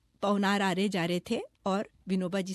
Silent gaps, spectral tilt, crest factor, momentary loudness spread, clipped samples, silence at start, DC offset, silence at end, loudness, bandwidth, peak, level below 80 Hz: none; -5.5 dB/octave; 16 dB; 7 LU; under 0.1%; 0.2 s; under 0.1%; 0 s; -30 LUFS; 12.5 kHz; -16 dBFS; -66 dBFS